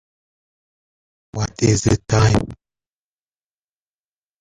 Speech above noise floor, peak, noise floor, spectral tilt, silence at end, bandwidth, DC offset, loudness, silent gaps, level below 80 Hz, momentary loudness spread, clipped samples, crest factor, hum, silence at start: over 73 dB; -2 dBFS; under -90 dBFS; -5.5 dB/octave; 1.85 s; 10.5 kHz; under 0.1%; -18 LUFS; none; -38 dBFS; 15 LU; under 0.1%; 20 dB; 50 Hz at -40 dBFS; 1.35 s